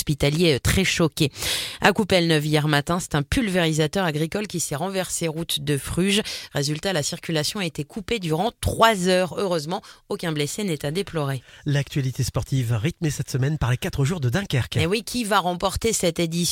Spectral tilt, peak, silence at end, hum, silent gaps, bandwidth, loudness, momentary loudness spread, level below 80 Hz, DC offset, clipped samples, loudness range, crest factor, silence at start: -4.5 dB/octave; -2 dBFS; 0 s; none; none; 17 kHz; -23 LUFS; 7 LU; -42 dBFS; under 0.1%; under 0.1%; 4 LU; 20 dB; 0 s